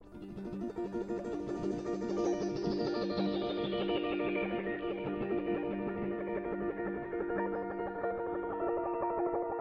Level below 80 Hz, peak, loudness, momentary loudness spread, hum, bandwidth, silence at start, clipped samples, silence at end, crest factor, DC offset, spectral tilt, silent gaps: -60 dBFS; -22 dBFS; -36 LUFS; 5 LU; none; 7.8 kHz; 0 s; under 0.1%; 0 s; 12 dB; under 0.1%; -6.5 dB/octave; none